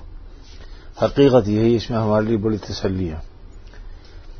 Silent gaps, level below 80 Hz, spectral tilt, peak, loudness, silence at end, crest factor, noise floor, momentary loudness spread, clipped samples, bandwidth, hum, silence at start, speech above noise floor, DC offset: none; -38 dBFS; -7.5 dB/octave; -4 dBFS; -19 LUFS; 0 s; 18 dB; -39 dBFS; 11 LU; under 0.1%; 6.6 kHz; none; 0 s; 21 dB; under 0.1%